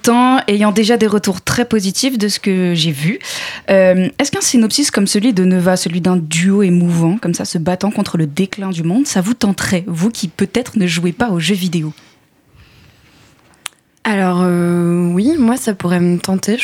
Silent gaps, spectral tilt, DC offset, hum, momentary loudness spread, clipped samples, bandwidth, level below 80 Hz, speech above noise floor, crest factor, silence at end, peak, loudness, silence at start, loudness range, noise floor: none; -5 dB/octave; under 0.1%; none; 7 LU; under 0.1%; 16.5 kHz; -50 dBFS; 36 dB; 14 dB; 0 s; 0 dBFS; -14 LUFS; 0.05 s; 6 LU; -50 dBFS